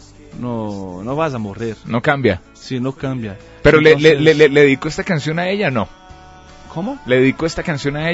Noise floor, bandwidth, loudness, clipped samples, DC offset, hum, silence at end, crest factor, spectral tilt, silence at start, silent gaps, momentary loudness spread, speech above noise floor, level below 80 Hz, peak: -40 dBFS; 8 kHz; -16 LUFS; under 0.1%; under 0.1%; none; 0 s; 16 dB; -6 dB/octave; 0.35 s; none; 16 LU; 24 dB; -40 dBFS; 0 dBFS